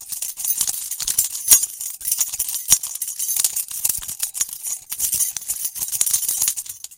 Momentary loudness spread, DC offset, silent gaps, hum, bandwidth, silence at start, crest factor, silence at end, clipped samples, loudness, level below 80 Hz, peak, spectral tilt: 11 LU; under 0.1%; none; none; 17.5 kHz; 0 s; 22 dB; 0.05 s; under 0.1%; -19 LUFS; -54 dBFS; 0 dBFS; 2.5 dB/octave